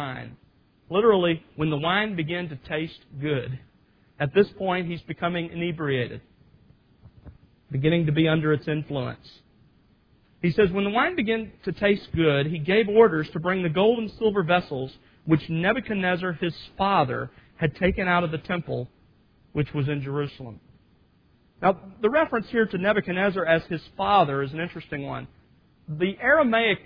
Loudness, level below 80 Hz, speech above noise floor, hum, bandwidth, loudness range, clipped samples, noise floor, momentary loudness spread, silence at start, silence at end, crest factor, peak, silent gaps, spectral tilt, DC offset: -24 LUFS; -52 dBFS; 37 dB; none; 5.2 kHz; 6 LU; under 0.1%; -61 dBFS; 13 LU; 0 s; 0.1 s; 20 dB; -4 dBFS; none; -9 dB/octave; under 0.1%